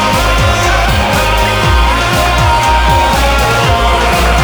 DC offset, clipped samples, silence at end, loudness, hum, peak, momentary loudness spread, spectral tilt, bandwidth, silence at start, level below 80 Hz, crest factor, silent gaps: under 0.1%; under 0.1%; 0 s; -10 LUFS; none; 0 dBFS; 1 LU; -4 dB/octave; over 20 kHz; 0 s; -14 dBFS; 10 dB; none